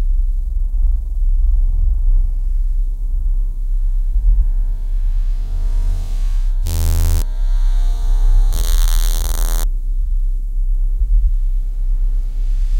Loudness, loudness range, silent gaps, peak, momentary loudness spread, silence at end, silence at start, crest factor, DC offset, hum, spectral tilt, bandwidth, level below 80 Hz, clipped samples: -21 LUFS; 3 LU; none; -2 dBFS; 6 LU; 0 s; 0 s; 12 dB; under 0.1%; none; -4.5 dB/octave; 17 kHz; -14 dBFS; under 0.1%